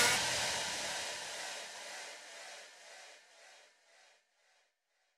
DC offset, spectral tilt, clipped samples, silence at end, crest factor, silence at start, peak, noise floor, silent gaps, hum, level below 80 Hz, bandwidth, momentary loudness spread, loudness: under 0.1%; 0 dB/octave; under 0.1%; 1.5 s; 24 dB; 0 s; -16 dBFS; -80 dBFS; none; none; -72 dBFS; 15 kHz; 24 LU; -37 LUFS